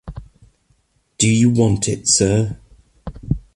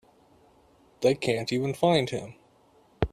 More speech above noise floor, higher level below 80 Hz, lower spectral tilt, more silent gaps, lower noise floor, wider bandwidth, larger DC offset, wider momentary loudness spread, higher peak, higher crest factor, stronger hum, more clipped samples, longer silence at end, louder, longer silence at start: first, 46 dB vs 35 dB; first, -38 dBFS vs -50 dBFS; about the same, -4.5 dB/octave vs -5.5 dB/octave; neither; about the same, -61 dBFS vs -61 dBFS; second, 11.5 kHz vs 14.5 kHz; neither; first, 23 LU vs 11 LU; first, -2 dBFS vs -6 dBFS; about the same, 18 dB vs 22 dB; neither; neither; about the same, 0.15 s vs 0.05 s; first, -16 LUFS vs -27 LUFS; second, 0.05 s vs 1 s